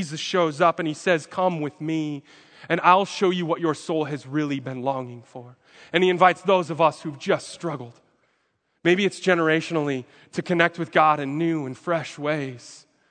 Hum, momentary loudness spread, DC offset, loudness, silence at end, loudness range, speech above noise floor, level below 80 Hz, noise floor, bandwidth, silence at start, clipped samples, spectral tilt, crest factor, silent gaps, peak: none; 13 LU; under 0.1%; -23 LUFS; 0.35 s; 2 LU; 47 dB; -76 dBFS; -71 dBFS; 9.4 kHz; 0 s; under 0.1%; -5.5 dB/octave; 22 dB; none; 0 dBFS